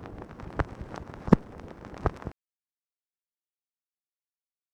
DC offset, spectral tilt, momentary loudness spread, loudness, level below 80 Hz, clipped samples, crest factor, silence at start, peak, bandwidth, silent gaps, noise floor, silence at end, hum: under 0.1%; -9 dB/octave; 20 LU; -29 LUFS; -44 dBFS; under 0.1%; 32 dB; 0 s; -2 dBFS; 9.4 kHz; none; under -90 dBFS; 2.4 s; none